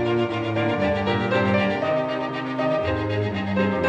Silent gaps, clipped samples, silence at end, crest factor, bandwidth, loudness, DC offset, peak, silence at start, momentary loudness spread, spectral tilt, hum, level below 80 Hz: none; under 0.1%; 0 s; 14 dB; 8.8 kHz; -23 LUFS; under 0.1%; -8 dBFS; 0 s; 4 LU; -7.5 dB/octave; none; -48 dBFS